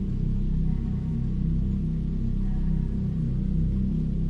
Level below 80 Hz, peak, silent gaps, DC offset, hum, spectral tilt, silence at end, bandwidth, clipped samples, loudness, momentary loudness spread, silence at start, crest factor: -28 dBFS; -14 dBFS; none; under 0.1%; none; -11 dB/octave; 0 s; 3.9 kHz; under 0.1%; -28 LUFS; 2 LU; 0 s; 12 dB